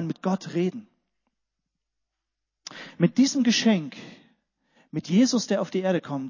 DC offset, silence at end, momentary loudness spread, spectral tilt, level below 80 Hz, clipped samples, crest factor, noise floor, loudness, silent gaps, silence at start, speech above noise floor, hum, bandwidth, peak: under 0.1%; 0 s; 20 LU; -5 dB/octave; -74 dBFS; under 0.1%; 20 dB; -83 dBFS; -24 LUFS; none; 0 s; 60 dB; none; 7.4 kHz; -8 dBFS